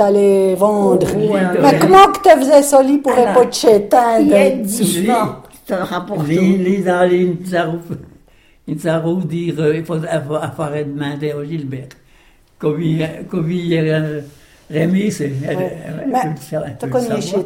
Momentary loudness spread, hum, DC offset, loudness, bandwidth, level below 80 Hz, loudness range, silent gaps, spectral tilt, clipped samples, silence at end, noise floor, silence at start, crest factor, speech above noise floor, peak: 14 LU; none; under 0.1%; -15 LUFS; 16.5 kHz; -48 dBFS; 11 LU; none; -6 dB/octave; under 0.1%; 0 s; -49 dBFS; 0 s; 14 dB; 35 dB; 0 dBFS